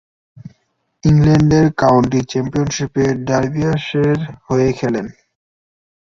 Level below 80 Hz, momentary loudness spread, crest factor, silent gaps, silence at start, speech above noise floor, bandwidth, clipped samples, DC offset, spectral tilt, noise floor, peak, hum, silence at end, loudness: -40 dBFS; 9 LU; 14 dB; none; 0.45 s; 52 dB; 7.4 kHz; under 0.1%; under 0.1%; -7 dB/octave; -66 dBFS; -2 dBFS; none; 1.05 s; -16 LUFS